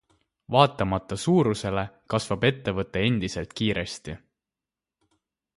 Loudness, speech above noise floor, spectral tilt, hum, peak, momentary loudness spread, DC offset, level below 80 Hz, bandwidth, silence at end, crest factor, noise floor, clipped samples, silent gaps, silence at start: -25 LUFS; 65 dB; -5.5 dB/octave; none; -2 dBFS; 11 LU; under 0.1%; -50 dBFS; 11.5 kHz; 1.4 s; 24 dB; -90 dBFS; under 0.1%; none; 0.5 s